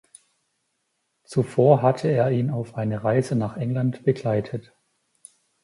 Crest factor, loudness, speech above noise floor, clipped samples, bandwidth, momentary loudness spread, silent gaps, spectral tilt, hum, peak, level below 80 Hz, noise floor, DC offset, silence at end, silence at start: 22 dB; -23 LUFS; 53 dB; under 0.1%; 11.5 kHz; 10 LU; none; -8.5 dB/octave; none; -2 dBFS; -60 dBFS; -74 dBFS; under 0.1%; 1.05 s; 1.3 s